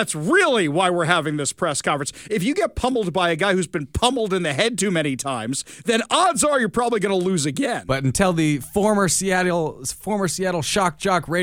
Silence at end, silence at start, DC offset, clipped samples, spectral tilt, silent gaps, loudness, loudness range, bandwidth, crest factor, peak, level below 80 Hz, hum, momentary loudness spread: 0 s; 0 s; under 0.1%; under 0.1%; -4 dB/octave; none; -20 LUFS; 2 LU; 19 kHz; 20 dB; -2 dBFS; -46 dBFS; none; 7 LU